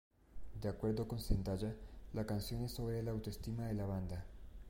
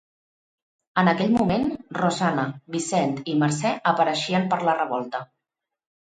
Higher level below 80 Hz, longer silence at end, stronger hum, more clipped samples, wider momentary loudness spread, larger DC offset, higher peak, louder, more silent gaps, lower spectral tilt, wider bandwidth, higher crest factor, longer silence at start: first, -48 dBFS vs -58 dBFS; second, 0 s vs 0.85 s; neither; neither; about the same, 10 LU vs 8 LU; neither; second, -22 dBFS vs -4 dBFS; second, -42 LUFS vs -23 LUFS; neither; first, -7 dB/octave vs -5.5 dB/octave; first, 16.5 kHz vs 9.6 kHz; about the same, 20 dB vs 20 dB; second, 0.3 s vs 0.95 s